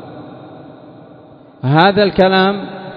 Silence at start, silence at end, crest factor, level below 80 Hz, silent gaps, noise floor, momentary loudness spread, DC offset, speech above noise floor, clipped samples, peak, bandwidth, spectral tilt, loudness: 0 s; 0 s; 16 dB; -48 dBFS; none; -41 dBFS; 23 LU; under 0.1%; 29 dB; under 0.1%; 0 dBFS; 5.2 kHz; -8.5 dB/octave; -13 LUFS